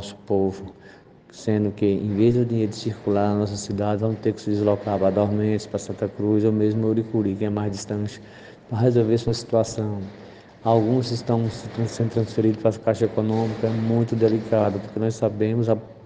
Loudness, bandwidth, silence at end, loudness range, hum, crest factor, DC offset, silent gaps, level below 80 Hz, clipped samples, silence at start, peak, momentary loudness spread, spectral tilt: -23 LUFS; 9.6 kHz; 0 s; 2 LU; none; 18 dB; under 0.1%; none; -58 dBFS; under 0.1%; 0 s; -6 dBFS; 8 LU; -7.5 dB/octave